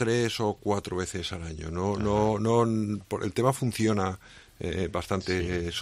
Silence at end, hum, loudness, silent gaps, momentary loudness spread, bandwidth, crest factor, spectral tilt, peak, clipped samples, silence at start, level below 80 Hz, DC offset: 0 s; none; -28 LUFS; none; 10 LU; 14.5 kHz; 18 dB; -5.5 dB/octave; -10 dBFS; under 0.1%; 0 s; -50 dBFS; under 0.1%